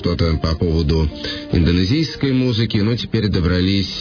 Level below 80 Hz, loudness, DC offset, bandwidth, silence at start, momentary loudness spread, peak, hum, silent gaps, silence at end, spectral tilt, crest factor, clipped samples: -28 dBFS; -18 LUFS; under 0.1%; 5.4 kHz; 0 s; 3 LU; -4 dBFS; none; none; 0 s; -7 dB/octave; 14 dB; under 0.1%